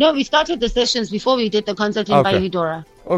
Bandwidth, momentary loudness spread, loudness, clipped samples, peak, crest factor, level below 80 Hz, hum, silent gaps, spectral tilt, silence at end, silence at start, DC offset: 11 kHz; 6 LU; -18 LUFS; under 0.1%; -2 dBFS; 16 dB; -40 dBFS; none; none; -4.5 dB/octave; 0 s; 0 s; under 0.1%